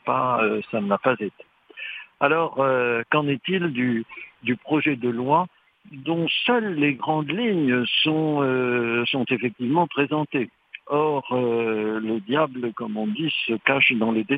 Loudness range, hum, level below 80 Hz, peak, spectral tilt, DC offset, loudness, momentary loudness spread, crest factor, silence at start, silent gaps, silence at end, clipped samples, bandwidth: 2 LU; none; -70 dBFS; -4 dBFS; -8.5 dB/octave; under 0.1%; -23 LUFS; 8 LU; 20 dB; 0.05 s; none; 0 s; under 0.1%; 5 kHz